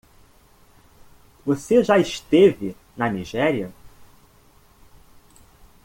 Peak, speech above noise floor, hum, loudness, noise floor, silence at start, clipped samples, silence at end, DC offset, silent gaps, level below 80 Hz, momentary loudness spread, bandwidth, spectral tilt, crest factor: -4 dBFS; 35 dB; none; -20 LUFS; -54 dBFS; 1.45 s; under 0.1%; 1.95 s; under 0.1%; none; -54 dBFS; 16 LU; 17 kHz; -6 dB/octave; 20 dB